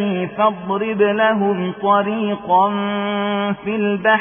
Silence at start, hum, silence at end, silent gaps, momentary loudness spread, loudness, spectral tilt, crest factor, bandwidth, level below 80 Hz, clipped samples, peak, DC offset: 0 s; none; 0 s; none; 6 LU; -18 LUFS; -11 dB/octave; 14 dB; 3.6 kHz; -58 dBFS; under 0.1%; -4 dBFS; under 0.1%